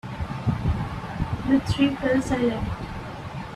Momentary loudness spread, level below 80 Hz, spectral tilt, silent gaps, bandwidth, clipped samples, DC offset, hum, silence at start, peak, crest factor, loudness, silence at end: 12 LU; -38 dBFS; -7 dB/octave; none; 12.5 kHz; under 0.1%; under 0.1%; none; 0.05 s; -8 dBFS; 16 dB; -26 LUFS; 0 s